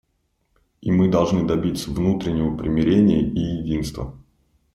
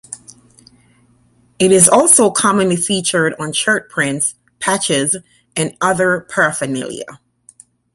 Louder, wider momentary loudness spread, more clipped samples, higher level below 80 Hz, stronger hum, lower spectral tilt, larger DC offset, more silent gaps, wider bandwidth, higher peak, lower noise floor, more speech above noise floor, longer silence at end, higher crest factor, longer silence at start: second, -21 LUFS vs -14 LUFS; second, 11 LU vs 15 LU; neither; first, -40 dBFS vs -56 dBFS; neither; first, -7.5 dB/octave vs -3 dB/octave; neither; neither; second, 13 kHz vs 16 kHz; second, -4 dBFS vs 0 dBFS; first, -69 dBFS vs -54 dBFS; first, 49 dB vs 39 dB; second, 0.55 s vs 0.8 s; about the same, 16 dB vs 16 dB; first, 0.85 s vs 0.1 s